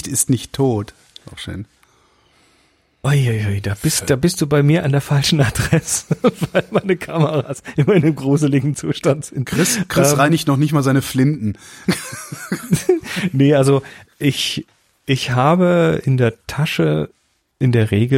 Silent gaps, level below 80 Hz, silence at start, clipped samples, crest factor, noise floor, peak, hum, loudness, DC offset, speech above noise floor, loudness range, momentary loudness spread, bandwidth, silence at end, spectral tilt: none; -44 dBFS; 0.05 s; under 0.1%; 16 dB; -58 dBFS; -2 dBFS; none; -17 LUFS; under 0.1%; 42 dB; 4 LU; 11 LU; 16.5 kHz; 0 s; -5.5 dB/octave